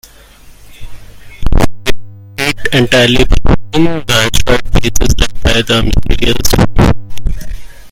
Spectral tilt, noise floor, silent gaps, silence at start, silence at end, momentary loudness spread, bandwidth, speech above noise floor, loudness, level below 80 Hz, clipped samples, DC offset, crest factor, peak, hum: -4.5 dB/octave; -37 dBFS; none; 0.65 s; 0.05 s; 14 LU; 16.5 kHz; 30 dB; -12 LUFS; -16 dBFS; 1%; under 0.1%; 8 dB; 0 dBFS; none